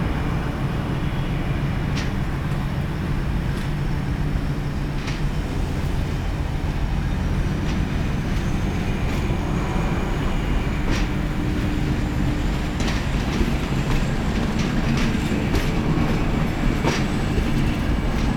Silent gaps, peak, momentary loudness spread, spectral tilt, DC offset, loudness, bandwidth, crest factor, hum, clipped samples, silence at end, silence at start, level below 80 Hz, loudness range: none; -6 dBFS; 4 LU; -6.5 dB/octave; under 0.1%; -24 LUFS; 17 kHz; 16 dB; none; under 0.1%; 0 s; 0 s; -26 dBFS; 3 LU